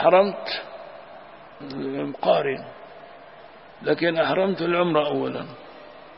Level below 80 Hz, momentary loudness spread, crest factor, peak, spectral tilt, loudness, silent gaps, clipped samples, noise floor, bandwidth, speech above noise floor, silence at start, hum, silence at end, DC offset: -68 dBFS; 23 LU; 20 dB; -4 dBFS; -10 dB/octave; -24 LUFS; none; under 0.1%; -46 dBFS; 5.8 kHz; 23 dB; 0 s; none; 0 s; 0.1%